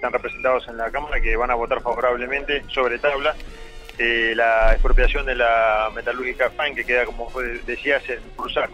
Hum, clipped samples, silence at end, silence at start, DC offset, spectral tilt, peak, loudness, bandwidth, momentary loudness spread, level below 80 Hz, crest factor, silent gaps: none; under 0.1%; 0 s; 0 s; under 0.1%; -5 dB/octave; -6 dBFS; -21 LUFS; 7.6 kHz; 10 LU; -26 dBFS; 16 dB; none